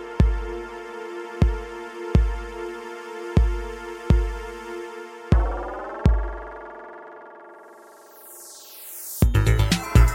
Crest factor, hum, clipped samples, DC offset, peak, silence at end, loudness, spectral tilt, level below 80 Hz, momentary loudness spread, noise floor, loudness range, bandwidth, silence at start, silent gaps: 20 dB; none; under 0.1%; under 0.1%; -2 dBFS; 0 s; -25 LUFS; -6 dB/octave; -26 dBFS; 20 LU; -47 dBFS; 5 LU; 17 kHz; 0 s; none